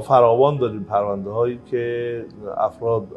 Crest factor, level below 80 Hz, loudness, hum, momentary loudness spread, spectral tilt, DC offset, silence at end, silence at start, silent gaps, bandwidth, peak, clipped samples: 18 dB; -56 dBFS; -21 LUFS; none; 12 LU; -8.5 dB/octave; under 0.1%; 0 s; 0 s; none; 11.5 kHz; -2 dBFS; under 0.1%